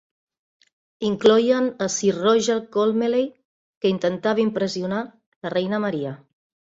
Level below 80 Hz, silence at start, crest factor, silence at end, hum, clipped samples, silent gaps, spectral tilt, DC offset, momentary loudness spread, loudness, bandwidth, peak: -66 dBFS; 1 s; 20 dB; 0.5 s; none; under 0.1%; 3.45-3.81 s, 5.26-5.41 s; -4.5 dB/octave; under 0.1%; 12 LU; -22 LUFS; 8 kHz; -4 dBFS